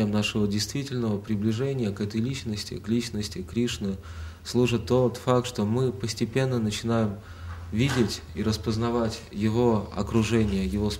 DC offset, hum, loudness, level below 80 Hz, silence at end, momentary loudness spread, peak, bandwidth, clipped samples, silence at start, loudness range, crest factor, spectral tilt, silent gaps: under 0.1%; none; -27 LUFS; -44 dBFS; 0 s; 8 LU; -8 dBFS; 16 kHz; under 0.1%; 0 s; 3 LU; 18 dB; -6 dB/octave; none